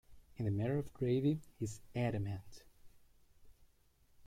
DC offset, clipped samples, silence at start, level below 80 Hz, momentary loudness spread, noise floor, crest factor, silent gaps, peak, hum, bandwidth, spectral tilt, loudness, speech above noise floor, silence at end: under 0.1%; under 0.1%; 0.1 s; -62 dBFS; 10 LU; -70 dBFS; 18 dB; none; -22 dBFS; none; 15.5 kHz; -7.5 dB/octave; -39 LUFS; 32 dB; 0 s